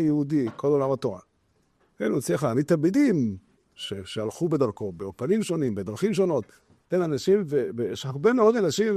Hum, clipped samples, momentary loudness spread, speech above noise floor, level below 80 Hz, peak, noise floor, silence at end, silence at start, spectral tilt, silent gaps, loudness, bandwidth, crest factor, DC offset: none; under 0.1%; 12 LU; 43 dB; -64 dBFS; -8 dBFS; -68 dBFS; 0 s; 0 s; -6.5 dB/octave; none; -25 LUFS; 13.5 kHz; 16 dB; under 0.1%